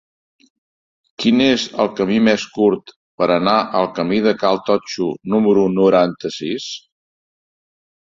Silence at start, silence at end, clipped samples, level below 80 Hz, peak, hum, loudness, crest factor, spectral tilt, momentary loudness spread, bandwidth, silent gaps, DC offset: 1.2 s; 1.25 s; under 0.1%; -58 dBFS; -2 dBFS; none; -17 LUFS; 16 dB; -5.5 dB/octave; 10 LU; 7.6 kHz; 2.96-3.18 s; under 0.1%